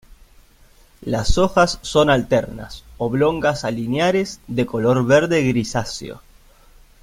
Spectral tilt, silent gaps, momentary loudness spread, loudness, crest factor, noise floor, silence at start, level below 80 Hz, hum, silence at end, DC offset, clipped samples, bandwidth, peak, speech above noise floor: -5.5 dB/octave; none; 15 LU; -19 LUFS; 18 dB; -50 dBFS; 1 s; -36 dBFS; none; 0.85 s; under 0.1%; under 0.1%; 16 kHz; -2 dBFS; 32 dB